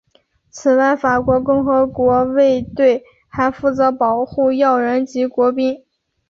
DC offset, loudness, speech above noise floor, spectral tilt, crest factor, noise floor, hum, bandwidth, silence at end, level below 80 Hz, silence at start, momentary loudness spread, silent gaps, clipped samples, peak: under 0.1%; -16 LUFS; 43 dB; -6.5 dB/octave; 14 dB; -58 dBFS; none; 7.4 kHz; 0.55 s; -46 dBFS; 0.55 s; 6 LU; none; under 0.1%; -2 dBFS